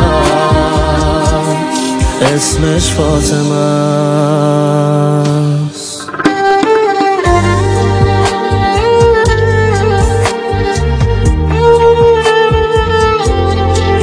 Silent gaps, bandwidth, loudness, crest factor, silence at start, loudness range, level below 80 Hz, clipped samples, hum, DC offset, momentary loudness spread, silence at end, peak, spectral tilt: none; 10.5 kHz; -11 LUFS; 10 dB; 0 s; 2 LU; -20 dBFS; under 0.1%; none; under 0.1%; 5 LU; 0 s; 0 dBFS; -5.5 dB/octave